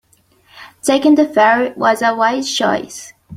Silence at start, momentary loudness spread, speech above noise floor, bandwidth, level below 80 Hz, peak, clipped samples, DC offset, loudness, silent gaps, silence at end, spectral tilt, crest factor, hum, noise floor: 0.55 s; 10 LU; 40 dB; 15 kHz; -60 dBFS; 0 dBFS; under 0.1%; under 0.1%; -14 LUFS; none; 0 s; -3.5 dB/octave; 14 dB; none; -54 dBFS